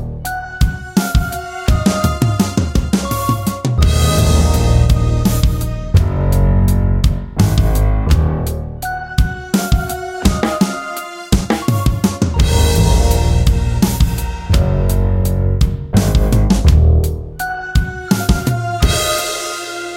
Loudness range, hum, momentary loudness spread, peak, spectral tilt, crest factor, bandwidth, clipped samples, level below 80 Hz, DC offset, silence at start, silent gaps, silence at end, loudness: 3 LU; none; 8 LU; 0 dBFS; -5.5 dB/octave; 14 dB; 17 kHz; under 0.1%; -18 dBFS; under 0.1%; 0 s; none; 0 s; -16 LUFS